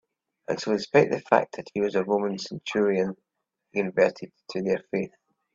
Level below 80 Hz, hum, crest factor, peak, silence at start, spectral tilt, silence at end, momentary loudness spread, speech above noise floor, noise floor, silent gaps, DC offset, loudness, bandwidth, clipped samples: -68 dBFS; none; 24 dB; -2 dBFS; 0.5 s; -6 dB/octave; 0.45 s; 12 LU; 52 dB; -77 dBFS; none; under 0.1%; -26 LUFS; 7.6 kHz; under 0.1%